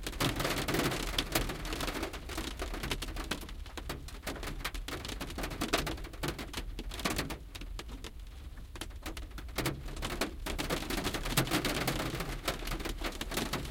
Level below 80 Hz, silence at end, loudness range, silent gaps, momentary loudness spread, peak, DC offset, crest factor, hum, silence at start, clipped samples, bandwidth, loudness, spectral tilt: -42 dBFS; 0 s; 6 LU; none; 13 LU; -12 dBFS; under 0.1%; 24 dB; none; 0 s; under 0.1%; 17 kHz; -36 LUFS; -3.5 dB/octave